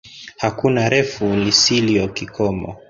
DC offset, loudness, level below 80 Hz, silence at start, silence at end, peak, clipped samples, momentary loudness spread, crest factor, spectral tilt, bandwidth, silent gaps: under 0.1%; -17 LUFS; -46 dBFS; 0.05 s; 0.1 s; -2 dBFS; under 0.1%; 11 LU; 18 dB; -4 dB/octave; 7.6 kHz; none